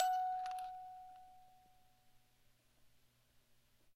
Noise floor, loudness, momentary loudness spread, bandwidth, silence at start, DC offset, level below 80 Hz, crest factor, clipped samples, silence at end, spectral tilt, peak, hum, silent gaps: -72 dBFS; -43 LUFS; 22 LU; 15.5 kHz; 0 s; under 0.1%; -78 dBFS; 26 dB; under 0.1%; 1.1 s; -0.5 dB/octave; -20 dBFS; 60 Hz at -85 dBFS; none